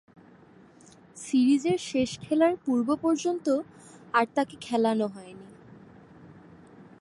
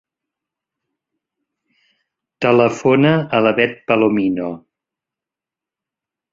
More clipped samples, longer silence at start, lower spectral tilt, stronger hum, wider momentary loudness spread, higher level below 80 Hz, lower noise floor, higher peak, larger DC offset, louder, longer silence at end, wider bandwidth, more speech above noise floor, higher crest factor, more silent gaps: neither; second, 1.15 s vs 2.4 s; second, -5 dB/octave vs -7 dB/octave; neither; first, 17 LU vs 9 LU; second, -68 dBFS vs -60 dBFS; second, -54 dBFS vs -88 dBFS; second, -8 dBFS vs -2 dBFS; neither; second, -26 LUFS vs -16 LUFS; second, 0.7 s vs 1.75 s; first, 11.5 kHz vs 7.6 kHz; second, 28 dB vs 73 dB; about the same, 20 dB vs 18 dB; neither